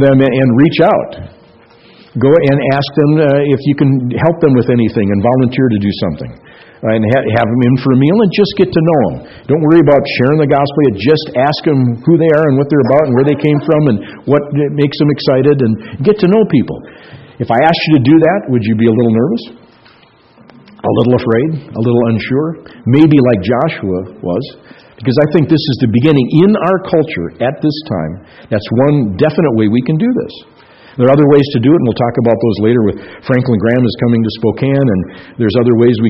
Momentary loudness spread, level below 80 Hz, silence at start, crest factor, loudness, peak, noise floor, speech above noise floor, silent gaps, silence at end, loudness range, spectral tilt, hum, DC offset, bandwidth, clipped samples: 10 LU; -44 dBFS; 0 s; 10 dB; -11 LUFS; 0 dBFS; -45 dBFS; 34 dB; none; 0 s; 3 LU; -10 dB/octave; none; under 0.1%; 5.8 kHz; 0.2%